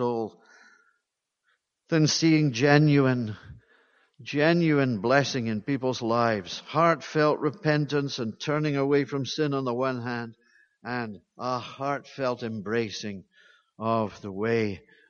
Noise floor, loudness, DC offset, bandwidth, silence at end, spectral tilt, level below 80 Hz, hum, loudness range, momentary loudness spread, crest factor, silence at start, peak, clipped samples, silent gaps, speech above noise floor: -82 dBFS; -26 LUFS; under 0.1%; 7.2 kHz; 0.3 s; -5.5 dB/octave; -66 dBFS; none; 8 LU; 13 LU; 22 dB; 0 s; -6 dBFS; under 0.1%; none; 56 dB